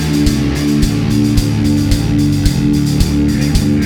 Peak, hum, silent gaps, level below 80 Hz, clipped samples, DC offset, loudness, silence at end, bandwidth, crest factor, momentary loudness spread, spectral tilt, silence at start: 0 dBFS; none; none; -20 dBFS; under 0.1%; under 0.1%; -13 LUFS; 0 s; 18.5 kHz; 12 dB; 1 LU; -6 dB/octave; 0 s